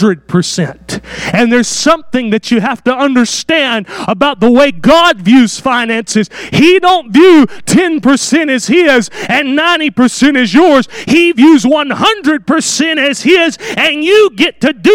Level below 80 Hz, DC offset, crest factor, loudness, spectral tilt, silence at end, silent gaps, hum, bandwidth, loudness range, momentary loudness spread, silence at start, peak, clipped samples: -44 dBFS; under 0.1%; 8 dB; -9 LUFS; -4 dB/octave; 0 s; none; none; 16 kHz; 3 LU; 7 LU; 0 s; 0 dBFS; 0.8%